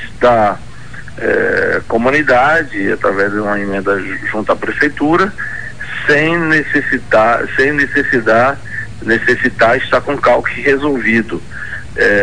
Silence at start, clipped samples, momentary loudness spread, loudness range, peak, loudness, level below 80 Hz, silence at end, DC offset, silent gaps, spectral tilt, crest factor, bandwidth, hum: 0 s; under 0.1%; 12 LU; 2 LU; 0 dBFS; -13 LUFS; -38 dBFS; 0 s; 4%; none; -6 dB/octave; 14 dB; 10.5 kHz; none